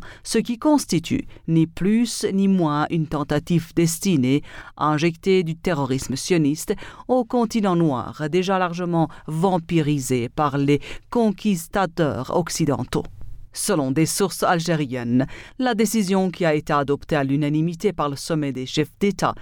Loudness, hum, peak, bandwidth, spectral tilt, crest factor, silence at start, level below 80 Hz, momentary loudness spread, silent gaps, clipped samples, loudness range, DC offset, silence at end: -22 LUFS; none; -6 dBFS; 19 kHz; -5.5 dB/octave; 16 dB; 0 s; -46 dBFS; 5 LU; none; under 0.1%; 2 LU; under 0.1%; 0 s